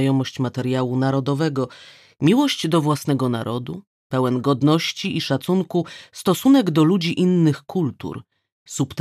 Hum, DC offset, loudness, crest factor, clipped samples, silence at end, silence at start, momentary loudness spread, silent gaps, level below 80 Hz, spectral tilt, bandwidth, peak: none; under 0.1%; -20 LUFS; 16 dB; under 0.1%; 0 s; 0 s; 12 LU; 3.87-4.10 s, 8.52-8.66 s; -62 dBFS; -6 dB/octave; 14.5 kHz; -4 dBFS